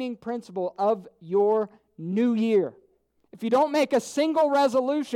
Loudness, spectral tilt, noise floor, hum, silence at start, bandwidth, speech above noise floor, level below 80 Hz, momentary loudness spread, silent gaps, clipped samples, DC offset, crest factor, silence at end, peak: -25 LUFS; -5.5 dB/octave; -66 dBFS; none; 0 s; 15.5 kHz; 41 dB; -76 dBFS; 12 LU; none; under 0.1%; under 0.1%; 14 dB; 0 s; -12 dBFS